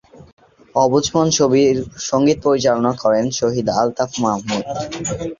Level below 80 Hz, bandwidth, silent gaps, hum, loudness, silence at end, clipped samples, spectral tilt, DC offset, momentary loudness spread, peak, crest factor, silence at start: -48 dBFS; 7.6 kHz; 0.33-0.37 s; none; -17 LUFS; 0.05 s; under 0.1%; -4.5 dB/octave; under 0.1%; 9 LU; -2 dBFS; 16 dB; 0.2 s